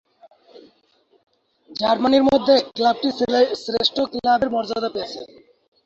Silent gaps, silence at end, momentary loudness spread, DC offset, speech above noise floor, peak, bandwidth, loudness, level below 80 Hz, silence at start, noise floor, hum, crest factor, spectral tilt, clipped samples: none; 0.6 s; 11 LU; under 0.1%; 42 dB; -4 dBFS; 7.8 kHz; -19 LUFS; -56 dBFS; 0.55 s; -61 dBFS; none; 18 dB; -4.5 dB/octave; under 0.1%